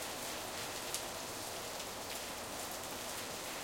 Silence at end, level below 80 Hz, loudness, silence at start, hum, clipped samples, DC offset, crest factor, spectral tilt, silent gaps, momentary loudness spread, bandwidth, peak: 0 s; -64 dBFS; -41 LUFS; 0 s; none; under 0.1%; under 0.1%; 24 dB; -1.5 dB/octave; none; 2 LU; 17 kHz; -18 dBFS